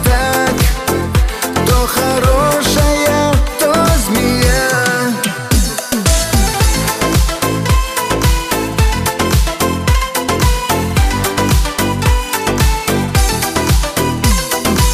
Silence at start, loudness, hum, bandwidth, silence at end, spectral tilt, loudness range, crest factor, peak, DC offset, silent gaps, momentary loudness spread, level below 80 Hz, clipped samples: 0 s; -14 LUFS; none; 16 kHz; 0 s; -4 dB/octave; 2 LU; 10 dB; -2 dBFS; under 0.1%; none; 4 LU; -18 dBFS; under 0.1%